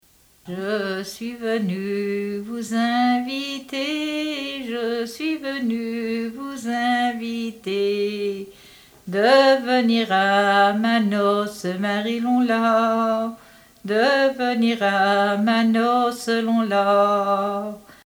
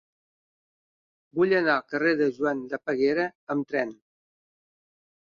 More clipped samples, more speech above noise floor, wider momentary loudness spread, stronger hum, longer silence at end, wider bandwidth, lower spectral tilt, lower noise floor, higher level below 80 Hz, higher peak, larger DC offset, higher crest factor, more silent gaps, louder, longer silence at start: neither; second, 28 dB vs over 65 dB; about the same, 11 LU vs 9 LU; neither; second, 0.25 s vs 1.25 s; first, over 20 kHz vs 7 kHz; second, -5 dB/octave vs -7 dB/octave; second, -48 dBFS vs under -90 dBFS; first, -64 dBFS vs -70 dBFS; first, -4 dBFS vs -10 dBFS; neither; about the same, 18 dB vs 18 dB; second, none vs 3.35-3.47 s; first, -21 LUFS vs -26 LUFS; second, 0.45 s vs 1.35 s